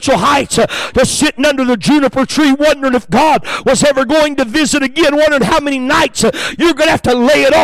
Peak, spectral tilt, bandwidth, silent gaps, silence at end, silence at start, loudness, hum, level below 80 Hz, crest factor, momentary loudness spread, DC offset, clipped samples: -4 dBFS; -3.5 dB/octave; 16 kHz; none; 0 s; 0 s; -11 LUFS; none; -36 dBFS; 8 dB; 3 LU; under 0.1%; under 0.1%